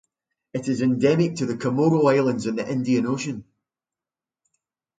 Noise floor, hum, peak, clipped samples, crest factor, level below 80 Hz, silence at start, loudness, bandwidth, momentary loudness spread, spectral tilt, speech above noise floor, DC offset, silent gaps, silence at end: under -90 dBFS; none; -6 dBFS; under 0.1%; 18 dB; -64 dBFS; 0.55 s; -22 LUFS; 9.2 kHz; 12 LU; -7 dB/octave; over 69 dB; under 0.1%; none; 1.6 s